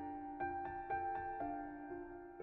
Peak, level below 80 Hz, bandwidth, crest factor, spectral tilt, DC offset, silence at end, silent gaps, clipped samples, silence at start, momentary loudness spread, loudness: -30 dBFS; -64 dBFS; 4.3 kHz; 14 dB; -6 dB/octave; under 0.1%; 0 s; none; under 0.1%; 0 s; 8 LU; -45 LUFS